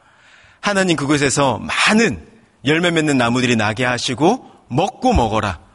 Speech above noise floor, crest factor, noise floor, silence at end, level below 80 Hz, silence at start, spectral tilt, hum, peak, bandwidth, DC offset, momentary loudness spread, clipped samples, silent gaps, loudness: 32 dB; 16 dB; -49 dBFS; 0.15 s; -36 dBFS; 0.65 s; -4.5 dB/octave; none; -2 dBFS; 11.5 kHz; under 0.1%; 7 LU; under 0.1%; none; -17 LUFS